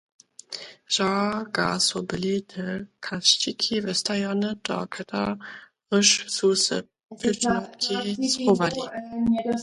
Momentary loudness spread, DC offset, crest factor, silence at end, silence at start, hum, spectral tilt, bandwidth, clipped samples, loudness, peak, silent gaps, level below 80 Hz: 13 LU; under 0.1%; 22 dB; 0 s; 0.5 s; none; -3 dB/octave; 11.5 kHz; under 0.1%; -24 LUFS; -2 dBFS; none; -60 dBFS